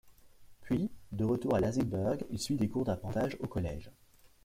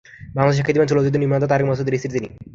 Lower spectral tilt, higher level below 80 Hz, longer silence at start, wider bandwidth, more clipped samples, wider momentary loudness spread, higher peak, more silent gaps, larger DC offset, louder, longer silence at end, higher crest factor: about the same, -7 dB/octave vs -7.5 dB/octave; second, -54 dBFS vs -48 dBFS; second, 0.05 s vs 0.2 s; first, 16 kHz vs 7.6 kHz; neither; about the same, 7 LU vs 9 LU; second, -20 dBFS vs 0 dBFS; neither; neither; second, -34 LUFS vs -19 LUFS; first, 0.55 s vs 0.05 s; about the same, 16 dB vs 18 dB